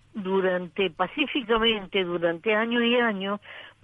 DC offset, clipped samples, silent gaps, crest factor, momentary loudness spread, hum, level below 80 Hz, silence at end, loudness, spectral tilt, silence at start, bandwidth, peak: under 0.1%; under 0.1%; none; 14 dB; 7 LU; none; -54 dBFS; 0.15 s; -25 LUFS; -7 dB/octave; 0.15 s; 4.9 kHz; -10 dBFS